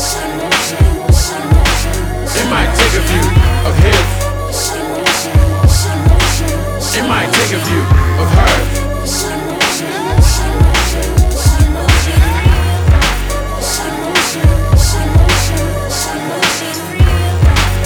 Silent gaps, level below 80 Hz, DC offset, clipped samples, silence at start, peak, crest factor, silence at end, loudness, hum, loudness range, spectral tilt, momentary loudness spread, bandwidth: none; -14 dBFS; under 0.1%; 0.3%; 0 s; 0 dBFS; 12 dB; 0 s; -12 LUFS; none; 1 LU; -4.5 dB/octave; 6 LU; 19 kHz